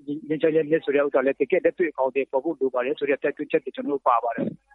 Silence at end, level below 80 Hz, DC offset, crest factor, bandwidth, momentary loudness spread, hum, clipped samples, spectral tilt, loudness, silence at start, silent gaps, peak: 0.2 s; -72 dBFS; under 0.1%; 18 dB; 4.1 kHz; 5 LU; none; under 0.1%; -9 dB/octave; -24 LUFS; 0.05 s; none; -6 dBFS